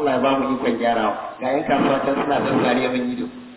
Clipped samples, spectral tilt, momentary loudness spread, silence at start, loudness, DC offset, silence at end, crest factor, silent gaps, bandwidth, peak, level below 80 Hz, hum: under 0.1%; -10 dB/octave; 5 LU; 0 s; -21 LUFS; under 0.1%; 0 s; 14 dB; none; 4 kHz; -6 dBFS; -54 dBFS; none